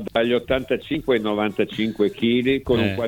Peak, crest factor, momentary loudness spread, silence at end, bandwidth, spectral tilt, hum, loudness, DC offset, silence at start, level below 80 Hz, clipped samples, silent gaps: -6 dBFS; 16 dB; 4 LU; 0 s; 17.5 kHz; -7 dB/octave; none; -22 LUFS; under 0.1%; 0 s; -46 dBFS; under 0.1%; none